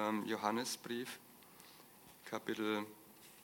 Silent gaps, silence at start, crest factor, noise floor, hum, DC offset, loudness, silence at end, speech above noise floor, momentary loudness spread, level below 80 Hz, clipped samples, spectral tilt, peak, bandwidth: none; 0 s; 22 dB; -61 dBFS; none; under 0.1%; -41 LUFS; 0 s; 20 dB; 20 LU; -88 dBFS; under 0.1%; -3.5 dB/octave; -20 dBFS; 17.5 kHz